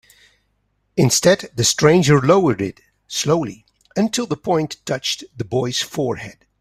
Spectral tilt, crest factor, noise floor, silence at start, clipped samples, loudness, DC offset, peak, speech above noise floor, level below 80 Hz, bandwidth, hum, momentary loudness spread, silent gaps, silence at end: -4.5 dB/octave; 18 dB; -67 dBFS; 0.95 s; under 0.1%; -18 LUFS; under 0.1%; 0 dBFS; 49 dB; -52 dBFS; 16 kHz; none; 13 LU; none; 0.3 s